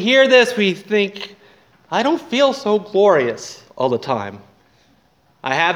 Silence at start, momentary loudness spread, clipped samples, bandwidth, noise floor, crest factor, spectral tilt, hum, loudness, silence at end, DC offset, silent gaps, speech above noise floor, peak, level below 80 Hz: 0 s; 18 LU; under 0.1%; 13 kHz; -57 dBFS; 18 dB; -4 dB/octave; none; -17 LUFS; 0 s; under 0.1%; none; 41 dB; 0 dBFS; -68 dBFS